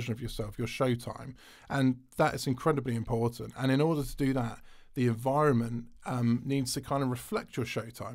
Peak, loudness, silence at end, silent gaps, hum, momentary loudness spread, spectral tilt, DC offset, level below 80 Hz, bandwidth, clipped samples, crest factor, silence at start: -14 dBFS; -31 LUFS; 0 s; none; none; 10 LU; -6.5 dB/octave; under 0.1%; -52 dBFS; 16 kHz; under 0.1%; 18 dB; 0 s